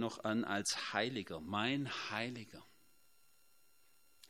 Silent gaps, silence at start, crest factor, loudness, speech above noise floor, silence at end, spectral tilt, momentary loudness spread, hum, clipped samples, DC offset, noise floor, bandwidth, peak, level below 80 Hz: none; 0 s; 24 dB; -39 LUFS; 33 dB; 0.05 s; -3.5 dB/octave; 11 LU; none; under 0.1%; under 0.1%; -73 dBFS; 16 kHz; -18 dBFS; -76 dBFS